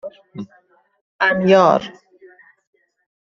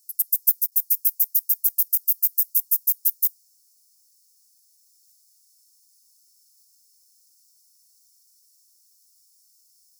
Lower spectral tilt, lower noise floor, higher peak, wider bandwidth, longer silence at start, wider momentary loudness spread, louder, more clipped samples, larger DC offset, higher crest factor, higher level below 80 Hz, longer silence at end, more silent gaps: first, -6 dB/octave vs 9 dB/octave; second, -48 dBFS vs -61 dBFS; about the same, -2 dBFS vs -4 dBFS; second, 7.4 kHz vs over 20 kHz; about the same, 0.05 s vs 0.1 s; first, 23 LU vs 2 LU; first, -15 LUFS vs -20 LUFS; neither; neither; second, 18 dB vs 24 dB; first, -62 dBFS vs under -90 dBFS; second, 1.35 s vs 6.7 s; first, 1.01-1.19 s vs none